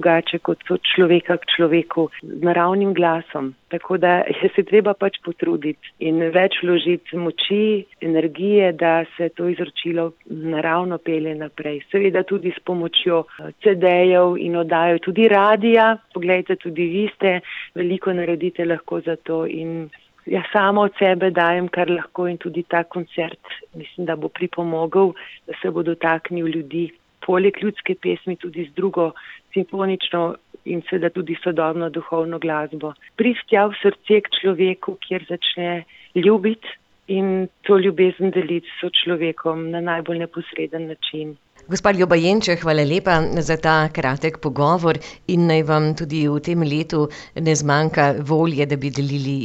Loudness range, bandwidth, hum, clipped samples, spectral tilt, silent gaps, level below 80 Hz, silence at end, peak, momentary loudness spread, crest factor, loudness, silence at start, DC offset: 6 LU; 8.2 kHz; none; under 0.1%; -6 dB/octave; none; -52 dBFS; 0 s; -4 dBFS; 11 LU; 16 dB; -20 LUFS; 0 s; under 0.1%